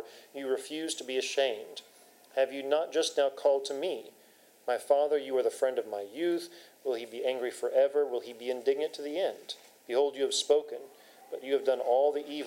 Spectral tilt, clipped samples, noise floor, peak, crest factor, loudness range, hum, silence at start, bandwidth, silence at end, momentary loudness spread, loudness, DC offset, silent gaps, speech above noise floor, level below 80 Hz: -2 dB/octave; under 0.1%; -60 dBFS; -12 dBFS; 18 dB; 2 LU; none; 0 s; 16 kHz; 0 s; 15 LU; -31 LUFS; under 0.1%; none; 30 dB; under -90 dBFS